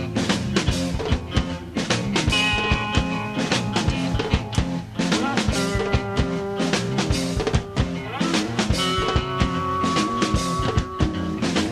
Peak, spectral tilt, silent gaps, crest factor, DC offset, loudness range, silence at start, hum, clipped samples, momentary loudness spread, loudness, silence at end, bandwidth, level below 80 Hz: -6 dBFS; -5 dB/octave; none; 18 dB; under 0.1%; 1 LU; 0 s; none; under 0.1%; 5 LU; -23 LUFS; 0 s; 14 kHz; -32 dBFS